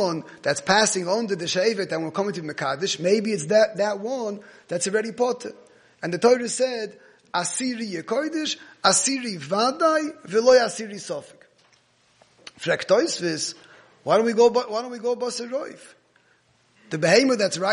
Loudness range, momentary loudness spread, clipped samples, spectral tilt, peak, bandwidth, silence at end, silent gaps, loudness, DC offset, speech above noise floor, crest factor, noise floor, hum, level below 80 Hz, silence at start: 4 LU; 14 LU; under 0.1%; -3 dB/octave; -2 dBFS; 10.5 kHz; 0 s; none; -23 LUFS; under 0.1%; 39 dB; 22 dB; -62 dBFS; none; -72 dBFS; 0 s